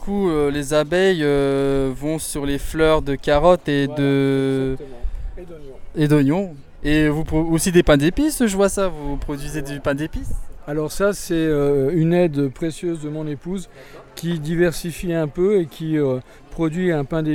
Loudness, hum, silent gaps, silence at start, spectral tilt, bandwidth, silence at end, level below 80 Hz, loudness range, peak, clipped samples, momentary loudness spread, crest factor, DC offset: -20 LUFS; none; none; 0 s; -6 dB/octave; 18 kHz; 0 s; -32 dBFS; 4 LU; -2 dBFS; under 0.1%; 14 LU; 18 dB; under 0.1%